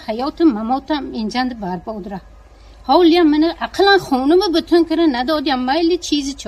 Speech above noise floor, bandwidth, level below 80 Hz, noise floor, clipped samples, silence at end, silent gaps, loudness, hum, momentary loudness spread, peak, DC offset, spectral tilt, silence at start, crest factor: 26 dB; 13 kHz; -42 dBFS; -42 dBFS; under 0.1%; 0 s; none; -16 LUFS; none; 13 LU; 0 dBFS; under 0.1%; -4.5 dB/octave; 0 s; 16 dB